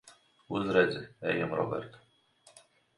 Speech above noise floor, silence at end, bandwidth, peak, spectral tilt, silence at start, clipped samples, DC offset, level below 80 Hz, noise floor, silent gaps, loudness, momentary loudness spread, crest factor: 33 dB; 1 s; 11.5 kHz; -10 dBFS; -6.5 dB/octave; 0.05 s; under 0.1%; under 0.1%; -66 dBFS; -64 dBFS; none; -31 LUFS; 11 LU; 24 dB